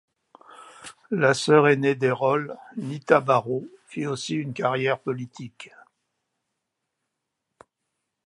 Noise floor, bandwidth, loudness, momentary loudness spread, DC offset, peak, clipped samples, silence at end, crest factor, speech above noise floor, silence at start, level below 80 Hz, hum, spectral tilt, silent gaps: -81 dBFS; 11.5 kHz; -23 LUFS; 22 LU; under 0.1%; -2 dBFS; under 0.1%; 2.6 s; 24 dB; 58 dB; 0.6 s; -74 dBFS; none; -5.5 dB/octave; none